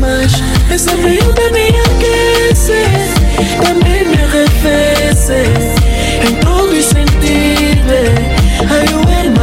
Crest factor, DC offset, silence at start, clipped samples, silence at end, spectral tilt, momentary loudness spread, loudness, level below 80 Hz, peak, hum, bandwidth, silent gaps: 8 dB; under 0.1%; 0 s; under 0.1%; 0 s; -5 dB/octave; 2 LU; -10 LUFS; -14 dBFS; 0 dBFS; none; 16.5 kHz; none